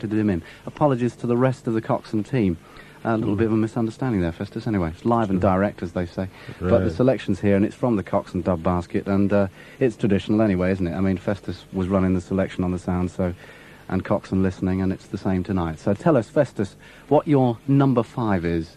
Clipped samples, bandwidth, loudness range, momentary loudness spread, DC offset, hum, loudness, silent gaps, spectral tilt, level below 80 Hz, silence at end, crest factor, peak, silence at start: under 0.1%; 11 kHz; 3 LU; 8 LU; under 0.1%; none; -23 LUFS; none; -8.5 dB/octave; -48 dBFS; 0.05 s; 18 dB; -4 dBFS; 0 s